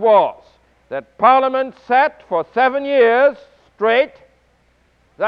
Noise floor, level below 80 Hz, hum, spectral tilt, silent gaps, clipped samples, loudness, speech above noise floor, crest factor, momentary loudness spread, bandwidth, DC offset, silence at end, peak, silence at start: -58 dBFS; -62 dBFS; none; -6 dB/octave; none; under 0.1%; -16 LUFS; 43 dB; 16 dB; 10 LU; 5.6 kHz; under 0.1%; 0 s; -2 dBFS; 0 s